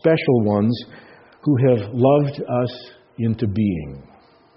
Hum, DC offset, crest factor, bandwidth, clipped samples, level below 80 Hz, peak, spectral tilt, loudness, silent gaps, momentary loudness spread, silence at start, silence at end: none; under 0.1%; 16 dB; 5.8 kHz; under 0.1%; -52 dBFS; -4 dBFS; -7.5 dB/octave; -20 LUFS; none; 16 LU; 0.05 s; 0.55 s